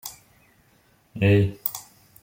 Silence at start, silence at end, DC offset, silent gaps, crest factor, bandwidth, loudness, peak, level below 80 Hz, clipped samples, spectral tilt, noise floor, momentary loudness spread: 0.05 s; 0.4 s; under 0.1%; none; 22 dB; 17 kHz; -23 LUFS; -4 dBFS; -58 dBFS; under 0.1%; -6.5 dB/octave; -61 dBFS; 20 LU